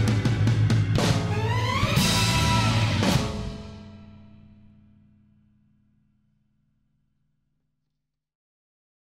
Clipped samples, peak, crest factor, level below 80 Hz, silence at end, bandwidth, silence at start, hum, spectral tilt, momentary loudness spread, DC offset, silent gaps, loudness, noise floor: under 0.1%; -10 dBFS; 16 dB; -40 dBFS; 5 s; 16 kHz; 0 s; none; -5 dB/octave; 14 LU; under 0.1%; none; -23 LUFS; -82 dBFS